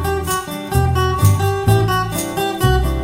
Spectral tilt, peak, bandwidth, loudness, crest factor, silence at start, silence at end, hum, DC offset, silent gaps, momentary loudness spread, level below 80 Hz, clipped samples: -5.5 dB/octave; 0 dBFS; 16.5 kHz; -17 LUFS; 16 dB; 0 s; 0 s; none; under 0.1%; none; 6 LU; -26 dBFS; under 0.1%